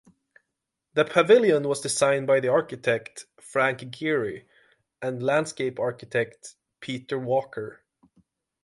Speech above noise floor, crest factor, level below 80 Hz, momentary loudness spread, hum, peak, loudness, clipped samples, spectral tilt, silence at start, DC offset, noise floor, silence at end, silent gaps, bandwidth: 59 dB; 20 dB; -70 dBFS; 18 LU; none; -6 dBFS; -25 LUFS; under 0.1%; -4.5 dB/octave; 0.95 s; under 0.1%; -83 dBFS; 0.9 s; none; 11.5 kHz